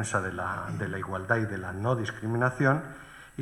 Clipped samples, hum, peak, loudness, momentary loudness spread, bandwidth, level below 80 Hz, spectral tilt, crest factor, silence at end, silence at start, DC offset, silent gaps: under 0.1%; none; -10 dBFS; -29 LUFS; 9 LU; 12.5 kHz; -58 dBFS; -6 dB/octave; 20 dB; 0 s; 0 s; under 0.1%; none